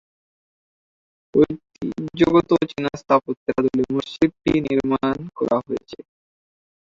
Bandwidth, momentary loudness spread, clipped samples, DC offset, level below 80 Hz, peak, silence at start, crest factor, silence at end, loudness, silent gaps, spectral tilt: 7.6 kHz; 13 LU; under 0.1%; under 0.1%; -50 dBFS; -2 dBFS; 1.35 s; 20 dB; 1 s; -21 LUFS; 3.37-3.46 s; -7.5 dB/octave